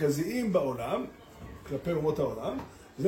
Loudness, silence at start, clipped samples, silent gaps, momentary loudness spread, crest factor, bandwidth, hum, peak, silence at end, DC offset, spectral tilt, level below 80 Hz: -31 LUFS; 0 s; under 0.1%; none; 18 LU; 16 dB; 16.5 kHz; none; -14 dBFS; 0 s; under 0.1%; -6.5 dB/octave; -54 dBFS